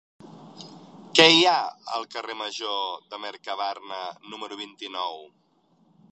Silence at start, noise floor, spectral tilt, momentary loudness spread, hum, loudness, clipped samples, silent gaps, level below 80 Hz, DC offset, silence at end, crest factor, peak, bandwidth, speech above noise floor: 0.25 s; -64 dBFS; -2.5 dB/octave; 24 LU; none; -23 LUFS; under 0.1%; none; -80 dBFS; under 0.1%; 0.85 s; 26 dB; 0 dBFS; 11 kHz; 38 dB